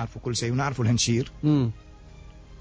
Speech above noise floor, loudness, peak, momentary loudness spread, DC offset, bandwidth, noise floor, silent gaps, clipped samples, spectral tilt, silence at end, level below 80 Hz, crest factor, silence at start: 21 dB; -25 LUFS; -12 dBFS; 7 LU; under 0.1%; 8 kHz; -46 dBFS; none; under 0.1%; -5 dB/octave; 0 s; -46 dBFS; 14 dB; 0 s